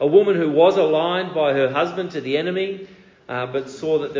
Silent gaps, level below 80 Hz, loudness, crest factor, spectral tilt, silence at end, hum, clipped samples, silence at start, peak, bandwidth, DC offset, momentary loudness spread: none; -66 dBFS; -20 LUFS; 18 dB; -6.5 dB/octave; 0 s; none; under 0.1%; 0 s; -2 dBFS; 7.6 kHz; under 0.1%; 12 LU